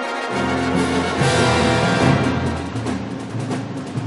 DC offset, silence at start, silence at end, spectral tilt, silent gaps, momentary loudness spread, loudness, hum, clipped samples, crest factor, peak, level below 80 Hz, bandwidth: under 0.1%; 0 s; 0 s; -5.5 dB/octave; none; 10 LU; -19 LUFS; none; under 0.1%; 16 dB; -4 dBFS; -40 dBFS; 11.5 kHz